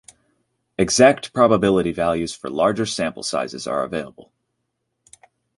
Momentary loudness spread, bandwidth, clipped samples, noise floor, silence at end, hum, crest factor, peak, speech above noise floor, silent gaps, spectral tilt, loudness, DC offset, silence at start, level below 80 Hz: 12 LU; 11.5 kHz; under 0.1%; -75 dBFS; 1.35 s; none; 20 dB; -2 dBFS; 56 dB; none; -4.5 dB/octave; -19 LUFS; under 0.1%; 0.8 s; -50 dBFS